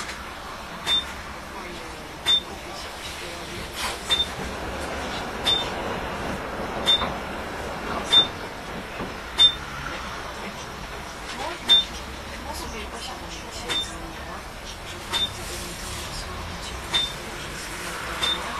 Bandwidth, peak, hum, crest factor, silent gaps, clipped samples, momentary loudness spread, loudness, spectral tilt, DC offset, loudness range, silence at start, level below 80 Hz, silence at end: 14 kHz; -6 dBFS; none; 22 dB; none; under 0.1%; 17 LU; -25 LUFS; -2 dB/octave; under 0.1%; 7 LU; 0 s; -42 dBFS; 0 s